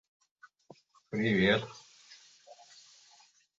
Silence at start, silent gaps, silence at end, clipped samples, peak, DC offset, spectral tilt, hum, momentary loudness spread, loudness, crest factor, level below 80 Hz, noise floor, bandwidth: 1.1 s; none; 1.05 s; under 0.1%; -12 dBFS; under 0.1%; -6 dB/octave; none; 28 LU; -29 LUFS; 24 dB; -64 dBFS; -64 dBFS; 7.8 kHz